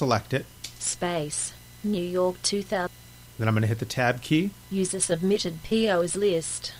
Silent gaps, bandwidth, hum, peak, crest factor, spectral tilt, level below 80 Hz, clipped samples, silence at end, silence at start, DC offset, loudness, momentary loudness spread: none; 16 kHz; 60 Hz at -50 dBFS; -10 dBFS; 18 dB; -4.5 dB/octave; -54 dBFS; under 0.1%; 0 s; 0 s; under 0.1%; -26 LUFS; 7 LU